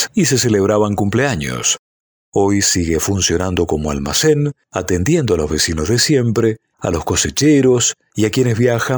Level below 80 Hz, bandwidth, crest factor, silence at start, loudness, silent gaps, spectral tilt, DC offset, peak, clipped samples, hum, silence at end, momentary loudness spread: -36 dBFS; over 20 kHz; 14 dB; 0 s; -15 LUFS; 1.79-2.32 s; -4 dB/octave; under 0.1%; -2 dBFS; under 0.1%; none; 0 s; 6 LU